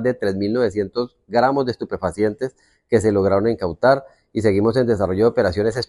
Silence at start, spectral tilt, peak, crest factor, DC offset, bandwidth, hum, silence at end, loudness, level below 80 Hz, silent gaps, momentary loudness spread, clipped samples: 0 s; -7 dB/octave; -2 dBFS; 18 dB; under 0.1%; 11.5 kHz; none; 0.05 s; -20 LUFS; -48 dBFS; none; 8 LU; under 0.1%